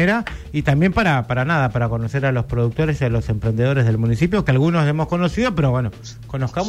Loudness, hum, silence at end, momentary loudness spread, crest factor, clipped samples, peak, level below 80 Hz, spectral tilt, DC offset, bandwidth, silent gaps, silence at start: -19 LUFS; none; 0 s; 6 LU; 12 dB; under 0.1%; -6 dBFS; -36 dBFS; -7.5 dB/octave; under 0.1%; 10 kHz; none; 0 s